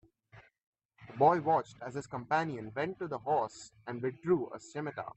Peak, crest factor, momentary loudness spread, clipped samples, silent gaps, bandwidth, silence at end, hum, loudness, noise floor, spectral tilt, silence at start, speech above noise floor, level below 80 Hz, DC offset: -14 dBFS; 20 dB; 14 LU; under 0.1%; 0.66-0.73 s, 0.85-0.89 s; 8.6 kHz; 0.05 s; none; -33 LUFS; -60 dBFS; -6.5 dB/octave; 0.35 s; 27 dB; -72 dBFS; under 0.1%